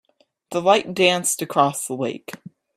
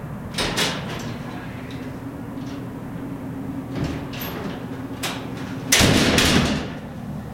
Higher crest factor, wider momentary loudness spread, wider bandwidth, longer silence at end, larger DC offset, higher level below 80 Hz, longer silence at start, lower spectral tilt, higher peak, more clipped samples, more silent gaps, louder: about the same, 20 dB vs 24 dB; about the same, 17 LU vs 17 LU; about the same, 16 kHz vs 16.5 kHz; first, 0.4 s vs 0 s; neither; second, -68 dBFS vs -40 dBFS; first, 0.5 s vs 0 s; about the same, -3 dB/octave vs -3.5 dB/octave; about the same, -2 dBFS vs -2 dBFS; neither; neither; first, -20 LUFS vs -23 LUFS